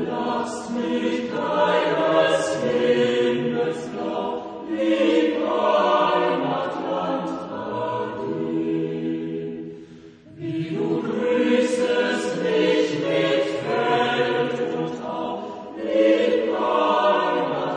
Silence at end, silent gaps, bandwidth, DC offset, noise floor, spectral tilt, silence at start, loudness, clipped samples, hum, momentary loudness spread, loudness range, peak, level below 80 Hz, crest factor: 0 s; none; 10 kHz; under 0.1%; -44 dBFS; -5.5 dB/octave; 0 s; -22 LUFS; under 0.1%; none; 10 LU; 6 LU; -6 dBFS; -64 dBFS; 16 dB